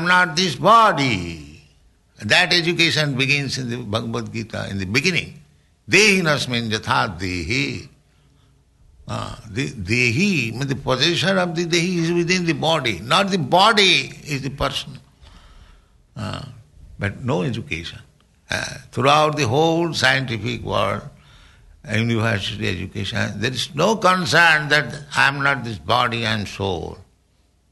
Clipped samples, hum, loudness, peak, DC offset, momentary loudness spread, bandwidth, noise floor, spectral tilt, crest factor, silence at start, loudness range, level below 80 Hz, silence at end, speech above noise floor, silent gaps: under 0.1%; none; -19 LUFS; -2 dBFS; under 0.1%; 14 LU; 12 kHz; -60 dBFS; -4 dB/octave; 18 dB; 0 s; 8 LU; -48 dBFS; 0.7 s; 41 dB; none